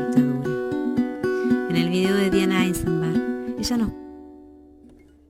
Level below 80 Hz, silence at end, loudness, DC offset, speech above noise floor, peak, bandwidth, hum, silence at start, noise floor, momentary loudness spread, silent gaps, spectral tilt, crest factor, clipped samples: -46 dBFS; 0.75 s; -23 LUFS; under 0.1%; 29 dB; -6 dBFS; 16.5 kHz; none; 0 s; -50 dBFS; 8 LU; none; -6 dB/octave; 16 dB; under 0.1%